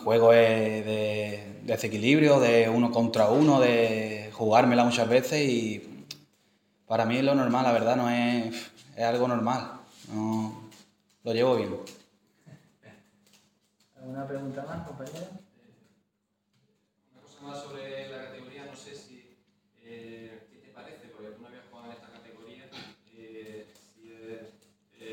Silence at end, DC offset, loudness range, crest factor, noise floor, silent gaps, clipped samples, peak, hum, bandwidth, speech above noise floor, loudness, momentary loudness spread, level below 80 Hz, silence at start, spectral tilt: 0 s; under 0.1%; 25 LU; 22 dB; -78 dBFS; none; under 0.1%; -6 dBFS; none; 16.5 kHz; 53 dB; -25 LUFS; 26 LU; -74 dBFS; 0 s; -5.5 dB/octave